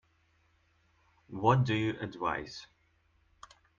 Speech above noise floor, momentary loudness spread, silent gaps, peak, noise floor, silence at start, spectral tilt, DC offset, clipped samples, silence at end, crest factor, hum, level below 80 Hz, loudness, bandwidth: 40 dB; 19 LU; none; -12 dBFS; -70 dBFS; 1.3 s; -7 dB/octave; under 0.1%; under 0.1%; 1.15 s; 24 dB; none; -64 dBFS; -31 LUFS; 7.2 kHz